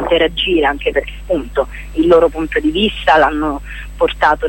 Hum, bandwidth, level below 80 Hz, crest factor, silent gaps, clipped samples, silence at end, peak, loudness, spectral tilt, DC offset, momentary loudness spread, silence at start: none; 17 kHz; -30 dBFS; 14 dB; none; under 0.1%; 0 s; 0 dBFS; -15 LUFS; -5.5 dB/octave; under 0.1%; 9 LU; 0 s